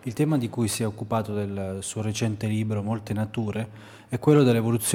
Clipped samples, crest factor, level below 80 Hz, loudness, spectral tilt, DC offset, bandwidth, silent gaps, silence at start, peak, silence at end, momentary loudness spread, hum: under 0.1%; 18 dB; -60 dBFS; -26 LUFS; -6 dB/octave; under 0.1%; 17 kHz; none; 0.05 s; -6 dBFS; 0 s; 11 LU; none